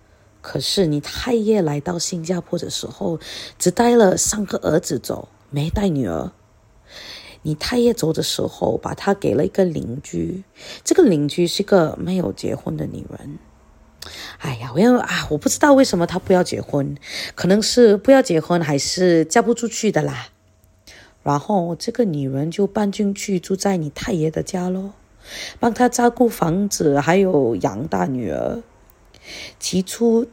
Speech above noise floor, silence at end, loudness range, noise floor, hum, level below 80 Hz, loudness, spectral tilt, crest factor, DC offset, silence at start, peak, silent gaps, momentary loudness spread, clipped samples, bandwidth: 36 dB; 0.05 s; 6 LU; -55 dBFS; none; -46 dBFS; -19 LUFS; -5 dB/octave; 18 dB; under 0.1%; 0.45 s; -2 dBFS; none; 15 LU; under 0.1%; 16.5 kHz